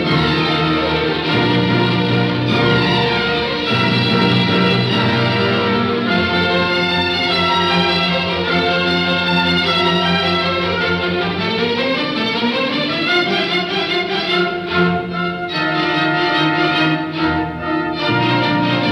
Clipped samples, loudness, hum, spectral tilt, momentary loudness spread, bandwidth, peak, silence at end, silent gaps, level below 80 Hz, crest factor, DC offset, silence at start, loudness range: under 0.1%; -15 LUFS; none; -6 dB/octave; 4 LU; 11 kHz; -2 dBFS; 0 s; none; -46 dBFS; 14 dB; under 0.1%; 0 s; 2 LU